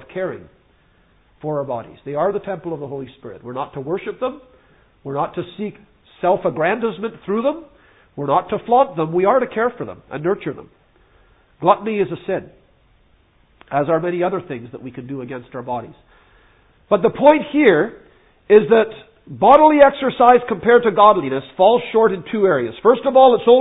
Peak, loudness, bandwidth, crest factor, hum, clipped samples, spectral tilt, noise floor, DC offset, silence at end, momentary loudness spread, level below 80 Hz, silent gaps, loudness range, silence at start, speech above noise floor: 0 dBFS; -17 LUFS; 4 kHz; 18 dB; none; under 0.1%; -9.5 dB/octave; -56 dBFS; under 0.1%; 0 s; 18 LU; -56 dBFS; none; 13 LU; 0.15 s; 39 dB